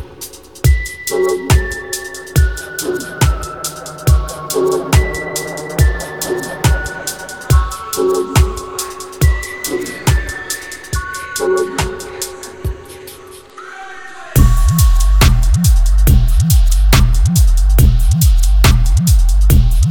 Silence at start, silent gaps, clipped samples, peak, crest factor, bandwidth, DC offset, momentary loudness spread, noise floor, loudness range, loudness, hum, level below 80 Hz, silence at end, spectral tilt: 0 s; none; under 0.1%; 0 dBFS; 12 dB; 18.5 kHz; under 0.1%; 13 LU; -35 dBFS; 7 LU; -15 LUFS; none; -14 dBFS; 0 s; -5 dB/octave